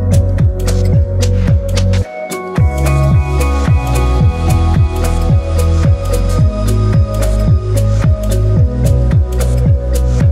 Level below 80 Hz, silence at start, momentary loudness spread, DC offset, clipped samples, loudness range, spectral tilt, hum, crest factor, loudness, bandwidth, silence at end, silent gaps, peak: -16 dBFS; 0 s; 3 LU; under 0.1%; under 0.1%; 1 LU; -7 dB/octave; none; 10 dB; -13 LUFS; 15.5 kHz; 0 s; none; 0 dBFS